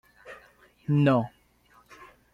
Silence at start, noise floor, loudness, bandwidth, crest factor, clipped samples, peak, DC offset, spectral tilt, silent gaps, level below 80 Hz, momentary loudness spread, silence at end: 0.25 s; -61 dBFS; -25 LUFS; 5.8 kHz; 18 dB; under 0.1%; -12 dBFS; under 0.1%; -9 dB/octave; none; -64 dBFS; 25 LU; 1.05 s